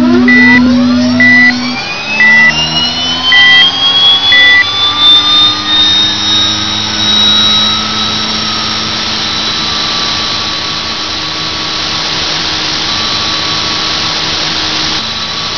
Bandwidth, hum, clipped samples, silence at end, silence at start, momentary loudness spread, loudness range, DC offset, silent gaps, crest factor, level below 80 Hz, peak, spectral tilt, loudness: 5.4 kHz; none; 1%; 0 s; 0 s; 9 LU; 7 LU; 2%; none; 10 dB; -38 dBFS; 0 dBFS; -2 dB/octave; -7 LUFS